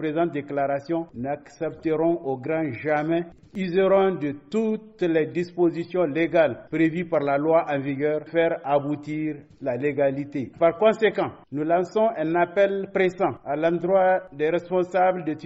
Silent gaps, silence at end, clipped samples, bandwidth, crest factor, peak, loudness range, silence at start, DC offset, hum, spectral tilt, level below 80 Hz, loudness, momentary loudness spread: none; 0 s; under 0.1%; 8 kHz; 16 dB; -8 dBFS; 2 LU; 0 s; under 0.1%; none; -5.5 dB/octave; -64 dBFS; -24 LUFS; 9 LU